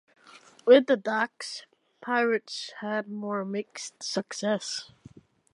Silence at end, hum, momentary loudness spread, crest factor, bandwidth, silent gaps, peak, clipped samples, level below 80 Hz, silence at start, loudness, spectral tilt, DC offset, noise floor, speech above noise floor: 0.7 s; none; 18 LU; 22 dB; 11.5 kHz; none; -6 dBFS; under 0.1%; -78 dBFS; 0.65 s; -27 LUFS; -3.5 dB/octave; under 0.1%; -54 dBFS; 27 dB